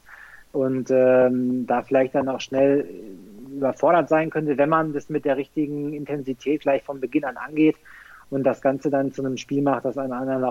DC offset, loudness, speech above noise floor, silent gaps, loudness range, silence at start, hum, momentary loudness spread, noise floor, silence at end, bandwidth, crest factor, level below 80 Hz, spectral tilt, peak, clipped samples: under 0.1%; -23 LUFS; 24 dB; none; 3 LU; 0.1 s; none; 10 LU; -46 dBFS; 0 s; 12 kHz; 16 dB; -62 dBFS; -7 dB/octave; -8 dBFS; under 0.1%